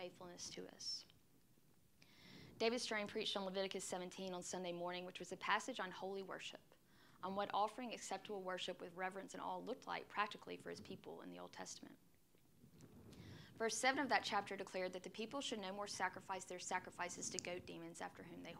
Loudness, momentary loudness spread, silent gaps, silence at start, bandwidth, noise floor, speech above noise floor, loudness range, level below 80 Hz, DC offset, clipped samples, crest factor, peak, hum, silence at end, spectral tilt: -46 LUFS; 14 LU; none; 0 s; 16 kHz; -74 dBFS; 28 dB; 6 LU; -84 dBFS; under 0.1%; under 0.1%; 26 dB; -20 dBFS; none; 0 s; -2.5 dB/octave